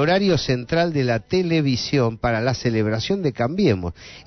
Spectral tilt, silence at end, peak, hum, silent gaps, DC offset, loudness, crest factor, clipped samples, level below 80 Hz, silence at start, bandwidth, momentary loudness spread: -6 dB/octave; 0.05 s; -6 dBFS; none; none; under 0.1%; -21 LUFS; 14 dB; under 0.1%; -44 dBFS; 0 s; 6.4 kHz; 3 LU